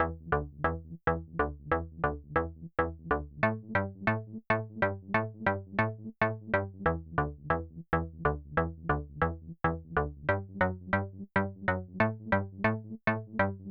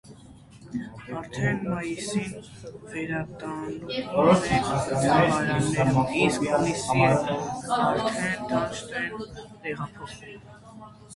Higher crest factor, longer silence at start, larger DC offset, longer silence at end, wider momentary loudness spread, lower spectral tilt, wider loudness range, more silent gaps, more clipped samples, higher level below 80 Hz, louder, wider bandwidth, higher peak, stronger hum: about the same, 20 dB vs 20 dB; about the same, 0 s vs 0.05 s; neither; about the same, 0 s vs 0 s; second, 4 LU vs 19 LU; first, -9.5 dB/octave vs -5.5 dB/octave; second, 1 LU vs 9 LU; neither; neither; first, -46 dBFS vs -52 dBFS; second, -32 LUFS vs -25 LUFS; second, 5.8 kHz vs 11.5 kHz; second, -12 dBFS vs -6 dBFS; neither